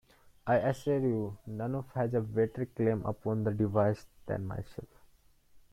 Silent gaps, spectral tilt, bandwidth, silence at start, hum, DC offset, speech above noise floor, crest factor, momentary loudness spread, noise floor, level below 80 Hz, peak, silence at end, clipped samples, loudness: none; -9 dB/octave; 14.5 kHz; 0.45 s; none; under 0.1%; 31 dB; 18 dB; 11 LU; -63 dBFS; -60 dBFS; -16 dBFS; 0.15 s; under 0.1%; -33 LUFS